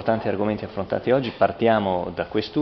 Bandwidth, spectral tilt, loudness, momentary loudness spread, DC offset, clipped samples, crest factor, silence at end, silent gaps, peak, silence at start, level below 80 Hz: 6.2 kHz; -5 dB/octave; -23 LUFS; 6 LU; under 0.1%; under 0.1%; 18 dB; 0 s; none; -4 dBFS; 0 s; -52 dBFS